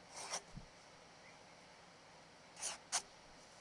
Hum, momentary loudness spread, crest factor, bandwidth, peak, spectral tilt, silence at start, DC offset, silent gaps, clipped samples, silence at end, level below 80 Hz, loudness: none; 19 LU; 26 dB; 12 kHz; -24 dBFS; -0.5 dB/octave; 0 s; under 0.1%; none; under 0.1%; 0 s; -70 dBFS; -45 LUFS